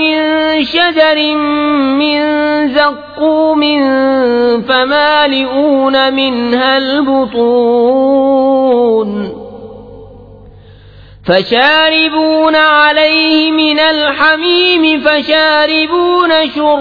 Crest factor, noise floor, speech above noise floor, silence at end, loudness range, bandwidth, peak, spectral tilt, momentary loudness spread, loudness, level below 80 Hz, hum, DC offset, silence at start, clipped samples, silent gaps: 10 dB; -36 dBFS; 26 dB; 0 s; 5 LU; 5.2 kHz; 0 dBFS; -6 dB/octave; 5 LU; -9 LUFS; -46 dBFS; none; 0.2%; 0 s; under 0.1%; none